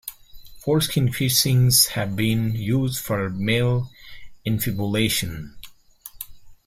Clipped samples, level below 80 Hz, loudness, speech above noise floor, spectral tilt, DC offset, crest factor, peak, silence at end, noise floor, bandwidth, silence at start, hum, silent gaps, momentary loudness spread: under 0.1%; -48 dBFS; -21 LUFS; 24 dB; -4 dB/octave; under 0.1%; 20 dB; -4 dBFS; 0.15 s; -45 dBFS; 16 kHz; 0.05 s; none; none; 20 LU